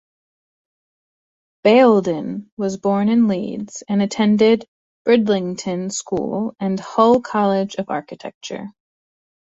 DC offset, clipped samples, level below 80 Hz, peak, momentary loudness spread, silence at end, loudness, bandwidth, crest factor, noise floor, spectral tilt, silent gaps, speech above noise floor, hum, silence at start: under 0.1%; under 0.1%; -60 dBFS; -2 dBFS; 15 LU; 0.85 s; -18 LUFS; 8 kHz; 18 dB; under -90 dBFS; -5.5 dB/octave; 2.52-2.57 s, 4.68-5.05 s, 8.34-8.41 s; over 72 dB; none; 1.65 s